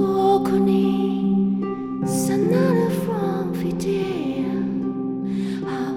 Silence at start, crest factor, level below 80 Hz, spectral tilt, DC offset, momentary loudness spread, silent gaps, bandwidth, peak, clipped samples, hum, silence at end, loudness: 0 s; 14 dB; -52 dBFS; -7 dB/octave; under 0.1%; 7 LU; none; 16.5 kHz; -6 dBFS; under 0.1%; none; 0 s; -22 LUFS